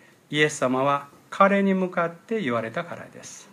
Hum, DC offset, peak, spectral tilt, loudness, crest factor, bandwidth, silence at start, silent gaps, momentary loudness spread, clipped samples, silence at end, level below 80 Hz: none; under 0.1%; -4 dBFS; -5 dB/octave; -24 LUFS; 20 dB; 13 kHz; 0.3 s; none; 19 LU; under 0.1%; 0.1 s; -76 dBFS